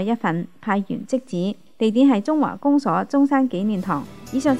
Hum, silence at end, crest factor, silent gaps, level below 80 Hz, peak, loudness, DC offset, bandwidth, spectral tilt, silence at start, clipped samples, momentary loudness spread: none; 0 s; 16 dB; none; -60 dBFS; -6 dBFS; -21 LUFS; 0.5%; 11 kHz; -7 dB/octave; 0 s; under 0.1%; 9 LU